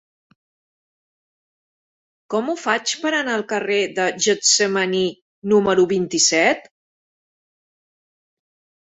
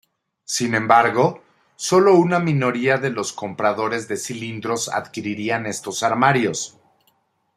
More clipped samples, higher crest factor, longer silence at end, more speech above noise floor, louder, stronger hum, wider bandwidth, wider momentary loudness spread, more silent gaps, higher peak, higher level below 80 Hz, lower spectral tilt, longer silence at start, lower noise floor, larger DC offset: neither; about the same, 20 dB vs 20 dB; first, 2.2 s vs 0.9 s; first, over 71 dB vs 45 dB; about the same, -19 LUFS vs -20 LUFS; neither; second, 8.4 kHz vs 14.5 kHz; second, 9 LU vs 13 LU; first, 5.22-5.42 s vs none; about the same, -2 dBFS vs 0 dBFS; about the same, -64 dBFS vs -64 dBFS; second, -2.5 dB/octave vs -4.5 dB/octave; first, 2.3 s vs 0.5 s; first, under -90 dBFS vs -65 dBFS; neither